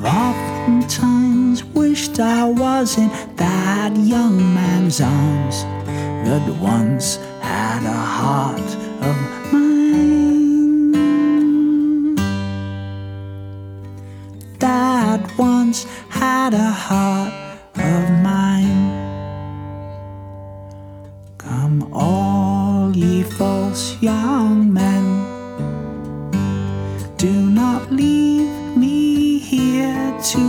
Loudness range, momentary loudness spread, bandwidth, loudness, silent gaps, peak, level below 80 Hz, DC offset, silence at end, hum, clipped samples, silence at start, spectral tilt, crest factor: 5 LU; 16 LU; 18.5 kHz; -17 LUFS; none; -2 dBFS; -46 dBFS; under 0.1%; 0 s; none; under 0.1%; 0 s; -6 dB/octave; 14 dB